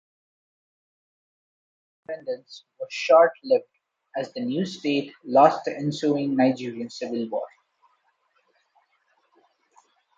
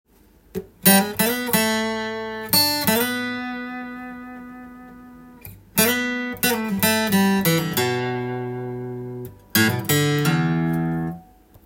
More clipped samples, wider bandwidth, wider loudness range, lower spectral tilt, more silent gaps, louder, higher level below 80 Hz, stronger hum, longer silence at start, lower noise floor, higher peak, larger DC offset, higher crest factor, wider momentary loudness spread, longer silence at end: neither; second, 7.8 kHz vs 17 kHz; first, 13 LU vs 6 LU; first, -6 dB/octave vs -4 dB/octave; neither; second, -24 LUFS vs -20 LUFS; second, -78 dBFS vs -54 dBFS; neither; first, 2.1 s vs 0.55 s; first, -69 dBFS vs -53 dBFS; about the same, -4 dBFS vs -2 dBFS; neither; about the same, 22 dB vs 22 dB; about the same, 17 LU vs 18 LU; first, 2.7 s vs 0.4 s